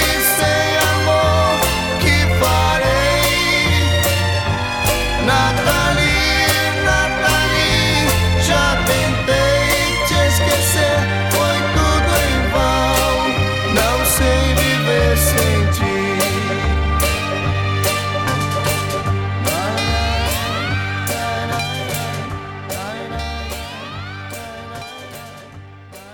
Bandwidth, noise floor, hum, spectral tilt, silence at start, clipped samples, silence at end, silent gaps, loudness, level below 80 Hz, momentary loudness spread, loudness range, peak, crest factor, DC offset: 19 kHz; -38 dBFS; none; -4 dB/octave; 0 s; under 0.1%; 0 s; none; -16 LUFS; -26 dBFS; 12 LU; 8 LU; -2 dBFS; 14 dB; under 0.1%